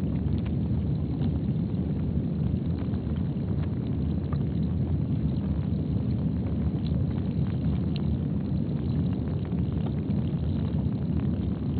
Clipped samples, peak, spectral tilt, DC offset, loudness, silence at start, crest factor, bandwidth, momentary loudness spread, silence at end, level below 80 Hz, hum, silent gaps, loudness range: under 0.1%; -14 dBFS; -10 dB/octave; under 0.1%; -28 LUFS; 0 s; 14 dB; 4.6 kHz; 2 LU; 0 s; -36 dBFS; none; none; 1 LU